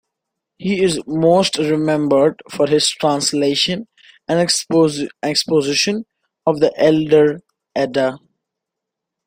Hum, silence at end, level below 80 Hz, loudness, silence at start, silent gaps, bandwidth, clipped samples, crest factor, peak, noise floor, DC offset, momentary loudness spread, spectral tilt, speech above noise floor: none; 1.1 s; -56 dBFS; -17 LUFS; 0.6 s; none; 16 kHz; under 0.1%; 16 dB; -2 dBFS; -82 dBFS; under 0.1%; 9 LU; -4 dB/octave; 66 dB